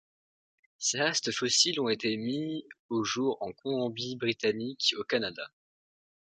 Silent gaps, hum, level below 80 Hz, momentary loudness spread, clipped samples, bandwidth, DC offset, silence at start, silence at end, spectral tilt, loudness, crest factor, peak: 2.79-2.89 s; none; -74 dBFS; 11 LU; under 0.1%; 9.6 kHz; under 0.1%; 0.8 s; 0.8 s; -2.5 dB/octave; -30 LUFS; 20 dB; -12 dBFS